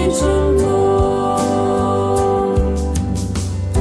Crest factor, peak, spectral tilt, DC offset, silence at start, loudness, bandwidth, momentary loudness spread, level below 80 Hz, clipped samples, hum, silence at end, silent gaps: 10 dB; -4 dBFS; -6.5 dB/octave; under 0.1%; 0 s; -17 LUFS; 11 kHz; 6 LU; -24 dBFS; under 0.1%; none; 0 s; none